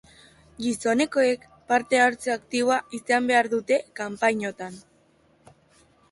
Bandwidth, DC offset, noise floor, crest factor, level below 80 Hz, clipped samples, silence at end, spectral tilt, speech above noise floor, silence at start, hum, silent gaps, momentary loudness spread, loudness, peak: 11.5 kHz; under 0.1%; -61 dBFS; 18 dB; -66 dBFS; under 0.1%; 1.3 s; -3.5 dB/octave; 37 dB; 0.6 s; none; none; 11 LU; -24 LUFS; -8 dBFS